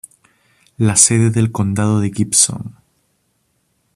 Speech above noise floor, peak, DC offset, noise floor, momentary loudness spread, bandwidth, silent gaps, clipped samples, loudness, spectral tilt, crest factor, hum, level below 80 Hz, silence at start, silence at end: 50 dB; 0 dBFS; under 0.1%; -65 dBFS; 9 LU; 15 kHz; none; under 0.1%; -14 LUFS; -4 dB/octave; 18 dB; none; -52 dBFS; 0.8 s; 1.25 s